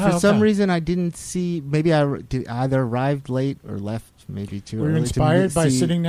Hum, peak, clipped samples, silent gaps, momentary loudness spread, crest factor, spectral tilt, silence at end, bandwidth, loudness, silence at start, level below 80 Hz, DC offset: none; -4 dBFS; under 0.1%; none; 13 LU; 16 dB; -6.5 dB/octave; 0 s; 15 kHz; -21 LUFS; 0 s; -42 dBFS; under 0.1%